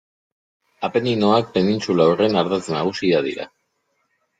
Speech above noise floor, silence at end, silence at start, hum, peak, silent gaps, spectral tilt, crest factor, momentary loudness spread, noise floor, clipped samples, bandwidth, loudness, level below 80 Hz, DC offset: 51 dB; 0.95 s; 0.8 s; none; -4 dBFS; none; -6 dB/octave; 18 dB; 11 LU; -70 dBFS; under 0.1%; 9.2 kHz; -19 LUFS; -60 dBFS; under 0.1%